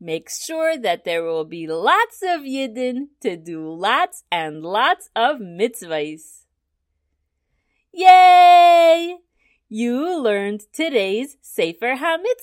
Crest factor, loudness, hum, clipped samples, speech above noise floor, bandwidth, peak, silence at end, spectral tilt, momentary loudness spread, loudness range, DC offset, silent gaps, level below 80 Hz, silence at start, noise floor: 18 dB; -17 LUFS; none; under 0.1%; 56 dB; 16 kHz; 0 dBFS; 0.1 s; -3 dB/octave; 18 LU; 9 LU; under 0.1%; none; -72 dBFS; 0 s; -74 dBFS